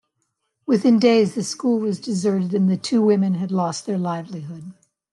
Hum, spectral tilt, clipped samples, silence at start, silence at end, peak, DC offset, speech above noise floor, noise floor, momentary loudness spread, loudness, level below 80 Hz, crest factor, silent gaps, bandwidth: none; -6.5 dB/octave; under 0.1%; 0.7 s; 0.4 s; -4 dBFS; under 0.1%; 54 dB; -74 dBFS; 17 LU; -20 LUFS; -70 dBFS; 16 dB; none; 11.5 kHz